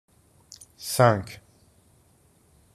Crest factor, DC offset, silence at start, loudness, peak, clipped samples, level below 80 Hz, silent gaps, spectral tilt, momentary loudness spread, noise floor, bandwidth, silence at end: 26 dB; under 0.1%; 0.8 s; -23 LUFS; -2 dBFS; under 0.1%; -62 dBFS; none; -5 dB/octave; 27 LU; -61 dBFS; 14.5 kHz; 1.4 s